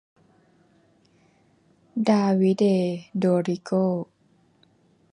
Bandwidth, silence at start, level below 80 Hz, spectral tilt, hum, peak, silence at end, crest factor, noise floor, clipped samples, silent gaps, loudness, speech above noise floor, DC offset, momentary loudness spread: 10 kHz; 1.95 s; -72 dBFS; -8 dB/octave; none; -8 dBFS; 1.1 s; 18 dB; -62 dBFS; under 0.1%; none; -23 LUFS; 40 dB; under 0.1%; 10 LU